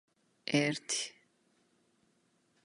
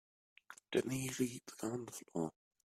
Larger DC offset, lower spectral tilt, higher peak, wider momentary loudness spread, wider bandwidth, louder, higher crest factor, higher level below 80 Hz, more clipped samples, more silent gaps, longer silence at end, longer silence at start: neither; second, -3.5 dB/octave vs -5 dB/octave; first, -14 dBFS vs -20 dBFS; first, 12 LU vs 8 LU; second, 11.5 kHz vs 15.5 kHz; first, -34 LUFS vs -41 LUFS; about the same, 26 dB vs 22 dB; second, -84 dBFS vs -76 dBFS; neither; neither; first, 1.55 s vs 0.4 s; about the same, 0.45 s vs 0.5 s